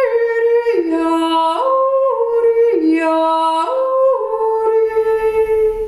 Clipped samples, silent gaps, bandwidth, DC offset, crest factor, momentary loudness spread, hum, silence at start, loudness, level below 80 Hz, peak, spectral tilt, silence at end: under 0.1%; none; 11.5 kHz; under 0.1%; 10 dB; 3 LU; none; 0 s; -15 LUFS; -46 dBFS; -4 dBFS; -4.5 dB/octave; 0 s